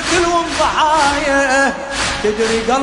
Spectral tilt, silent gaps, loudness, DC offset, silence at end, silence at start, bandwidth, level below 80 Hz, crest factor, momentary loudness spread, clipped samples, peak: -2.5 dB/octave; none; -14 LUFS; under 0.1%; 0 s; 0 s; 11 kHz; -36 dBFS; 14 dB; 4 LU; under 0.1%; -2 dBFS